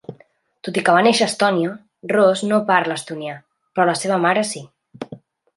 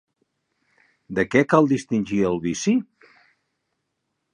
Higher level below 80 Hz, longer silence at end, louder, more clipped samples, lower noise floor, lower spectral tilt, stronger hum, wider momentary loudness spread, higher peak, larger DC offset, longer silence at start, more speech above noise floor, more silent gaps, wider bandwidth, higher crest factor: second, -70 dBFS vs -56 dBFS; second, 0.4 s vs 1.5 s; first, -18 LUFS vs -21 LUFS; neither; second, -55 dBFS vs -77 dBFS; second, -4 dB/octave vs -6 dB/octave; neither; first, 20 LU vs 7 LU; about the same, -2 dBFS vs -2 dBFS; neither; second, 0.1 s vs 1.1 s; second, 37 dB vs 57 dB; neither; about the same, 11.5 kHz vs 10.5 kHz; about the same, 18 dB vs 22 dB